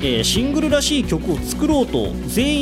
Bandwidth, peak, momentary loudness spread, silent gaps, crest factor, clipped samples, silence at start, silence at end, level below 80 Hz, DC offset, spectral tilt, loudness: 16 kHz; -6 dBFS; 5 LU; none; 12 dB; under 0.1%; 0 s; 0 s; -30 dBFS; under 0.1%; -4 dB/octave; -19 LUFS